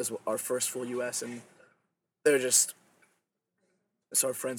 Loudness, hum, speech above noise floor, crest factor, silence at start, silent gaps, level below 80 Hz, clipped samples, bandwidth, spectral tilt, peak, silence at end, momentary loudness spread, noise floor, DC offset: -28 LUFS; none; 50 dB; 22 dB; 0 s; none; -82 dBFS; under 0.1%; 19 kHz; -1.5 dB/octave; -10 dBFS; 0 s; 12 LU; -80 dBFS; under 0.1%